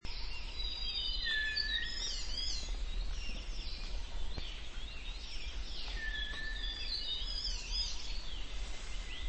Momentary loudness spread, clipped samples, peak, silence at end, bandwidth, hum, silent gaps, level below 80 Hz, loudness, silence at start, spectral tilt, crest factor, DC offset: 11 LU; under 0.1%; -22 dBFS; 0 s; 8.4 kHz; none; none; -42 dBFS; -39 LUFS; 0.05 s; -1.5 dB/octave; 14 dB; under 0.1%